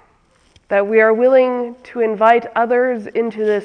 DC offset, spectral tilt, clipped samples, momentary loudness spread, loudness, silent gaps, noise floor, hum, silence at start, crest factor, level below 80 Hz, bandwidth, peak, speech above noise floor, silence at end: under 0.1%; -6.5 dB/octave; under 0.1%; 9 LU; -15 LUFS; none; -55 dBFS; none; 0.7 s; 16 dB; -62 dBFS; 6.2 kHz; 0 dBFS; 40 dB; 0 s